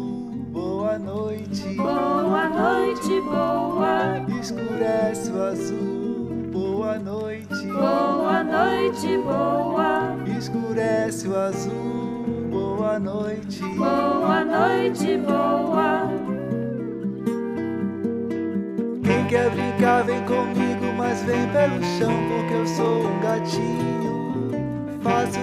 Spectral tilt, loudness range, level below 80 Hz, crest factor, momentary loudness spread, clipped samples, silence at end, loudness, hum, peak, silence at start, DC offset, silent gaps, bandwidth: -6.5 dB/octave; 4 LU; -56 dBFS; 16 dB; 7 LU; under 0.1%; 0 s; -23 LUFS; none; -6 dBFS; 0 s; under 0.1%; none; 14.5 kHz